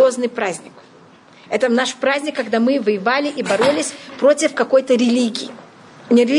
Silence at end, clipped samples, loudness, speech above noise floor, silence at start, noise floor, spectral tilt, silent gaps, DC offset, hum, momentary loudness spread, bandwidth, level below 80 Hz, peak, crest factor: 0 s; under 0.1%; -18 LUFS; 29 dB; 0 s; -46 dBFS; -3.5 dB/octave; none; under 0.1%; none; 9 LU; 11 kHz; -70 dBFS; -2 dBFS; 14 dB